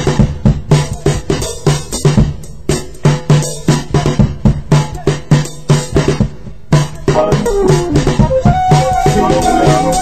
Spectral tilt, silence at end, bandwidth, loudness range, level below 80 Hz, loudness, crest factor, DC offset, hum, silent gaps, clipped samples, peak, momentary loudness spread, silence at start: -6 dB/octave; 0 s; 15 kHz; 3 LU; -22 dBFS; -13 LUFS; 12 dB; 4%; none; none; 0.4%; 0 dBFS; 6 LU; 0 s